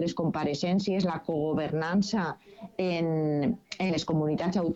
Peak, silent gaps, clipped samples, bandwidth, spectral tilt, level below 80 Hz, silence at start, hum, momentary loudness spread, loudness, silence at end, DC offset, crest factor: -16 dBFS; none; under 0.1%; 8 kHz; -6.5 dB/octave; -58 dBFS; 0 s; none; 4 LU; -29 LUFS; 0 s; under 0.1%; 12 dB